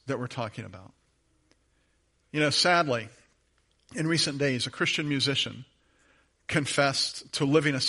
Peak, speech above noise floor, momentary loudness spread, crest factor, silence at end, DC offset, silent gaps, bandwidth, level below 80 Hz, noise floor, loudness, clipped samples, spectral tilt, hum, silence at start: -8 dBFS; 42 dB; 18 LU; 20 dB; 0 s; under 0.1%; none; 11.5 kHz; -66 dBFS; -70 dBFS; -27 LUFS; under 0.1%; -4 dB/octave; none; 0.05 s